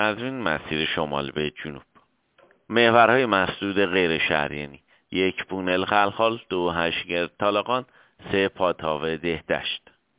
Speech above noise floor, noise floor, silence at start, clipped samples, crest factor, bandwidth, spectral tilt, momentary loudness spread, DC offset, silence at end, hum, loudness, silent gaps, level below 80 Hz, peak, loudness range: 37 dB; -61 dBFS; 0 s; under 0.1%; 22 dB; 4 kHz; -8.5 dB/octave; 11 LU; under 0.1%; 0.4 s; none; -23 LUFS; none; -52 dBFS; -2 dBFS; 4 LU